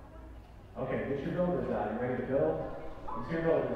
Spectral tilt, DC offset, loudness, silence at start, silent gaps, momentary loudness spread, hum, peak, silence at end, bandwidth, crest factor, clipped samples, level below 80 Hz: -9 dB/octave; under 0.1%; -34 LUFS; 0 s; none; 19 LU; none; -16 dBFS; 0 s; 7.4 kHz; 18 dB; under 0.1%; -50 dBFS